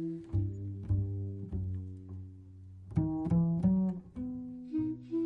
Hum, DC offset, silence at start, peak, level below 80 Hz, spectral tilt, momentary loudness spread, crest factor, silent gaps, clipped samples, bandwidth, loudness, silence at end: none; under 0.1%; 0 s; -18 dBFS; -50 dBFS; -12 dB/octave; 18 LU; 16 dB; none; under 0.1%; 3 kHz; -34 LUFS; 0 s